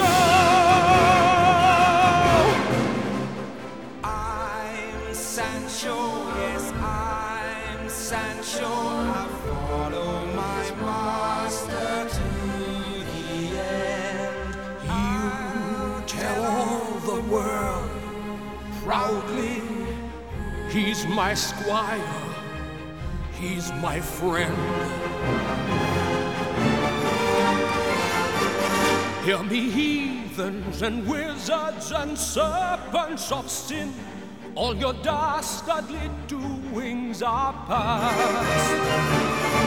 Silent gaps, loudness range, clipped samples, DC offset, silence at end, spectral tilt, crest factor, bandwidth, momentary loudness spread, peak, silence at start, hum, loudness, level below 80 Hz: none; 6 LU; under 0.1%; 0.4%; 0 s; -4.5 dB/octave; 18 dB; 19.5 kHz; 14 LU; -6 dBFS; 0 s; none; -24 LUFS; -40 dBFS